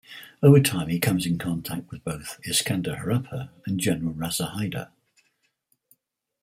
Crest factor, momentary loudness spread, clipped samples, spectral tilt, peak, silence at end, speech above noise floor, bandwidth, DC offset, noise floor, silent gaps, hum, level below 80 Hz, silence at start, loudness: 22 dB; 16 LU; under 0.1%; -5 dB/octave; -2 dBFS; 1.55 s; 48 dB; 16 kHz; under 0.1%; -72 dBFS; none; none; -56 dBFS; 0.1 s; -25 LUFS